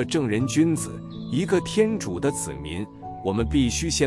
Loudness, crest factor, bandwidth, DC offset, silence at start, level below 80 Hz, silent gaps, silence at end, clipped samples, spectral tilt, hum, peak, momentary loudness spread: -24 LUFS; 16 dB; 12 kHz; under 0.1%; 0 s; -42 dBFS; none; 0 s; under 0.1%; -5 dB/octave; none; -8 dBFS; 11 LU